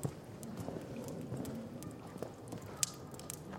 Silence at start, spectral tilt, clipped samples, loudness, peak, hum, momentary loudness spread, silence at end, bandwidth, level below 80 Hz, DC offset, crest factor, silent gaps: 0 s; -4 dB/octave; under 0.1%; -44 LUFS; -8 dBFS; none; 10 LU; 0 s; 16.5 kHz; -66 dBFS; under 0.1%; 36 dB; none